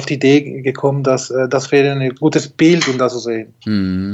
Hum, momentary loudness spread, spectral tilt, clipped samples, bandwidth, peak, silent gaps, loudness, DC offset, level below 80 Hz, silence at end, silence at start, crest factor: none; 8 LU; -5.5 dB/octave; under 0.1%; 8.2 kHz; -2 dBFS; none; -15 LUFS; under 0.1%; -58 dBFS; 0 s; 0 s; 14 dB